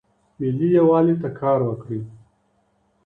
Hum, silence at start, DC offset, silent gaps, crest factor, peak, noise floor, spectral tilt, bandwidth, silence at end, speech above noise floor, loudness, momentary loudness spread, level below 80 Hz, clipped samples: none; 0.4 s; under 0.1%; none; 16 dB; -6 dBFS; -65 dBFS; -11.5 dB/octave; 4 kHz; 0.9 s; 46 dB; -20 LUFS; 16 LU; -60 dBFS; under 0.1%